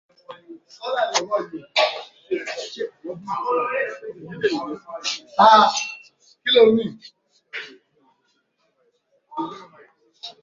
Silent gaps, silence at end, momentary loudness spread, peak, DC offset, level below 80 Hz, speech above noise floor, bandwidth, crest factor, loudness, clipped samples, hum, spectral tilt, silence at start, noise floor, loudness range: none; 0.1 s; 22 LU; -2 dBFS; under 0.1%; -70 dBFS; 48 dB; 7.6 kHz; 22 dB; -21 LUFS; under 0.1%; none; -3 dB/octave; 0.3 s; -68 dBFS; 11 LU